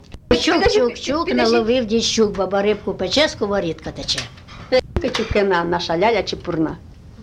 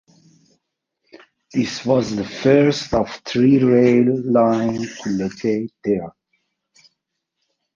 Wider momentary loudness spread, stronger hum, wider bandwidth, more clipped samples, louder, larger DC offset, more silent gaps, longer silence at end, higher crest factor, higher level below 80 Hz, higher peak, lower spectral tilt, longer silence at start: second, 7 LU vs 10 LU; neither; first, 12 kHz vs 7.4 kHz; neither; about the same, -19 LUFS vs -18 LUFS; neither; neither; second, 0 s vs 1.65 s; about the same, 18 dB vs 18 dB; first, -38 dBFS vs -50 dBFS; about the same, -2 dBFS vs -2 dBFS; second, -4 dB/octave vs -6.5 dB/octave; second, 0.1 s vs 1.55 s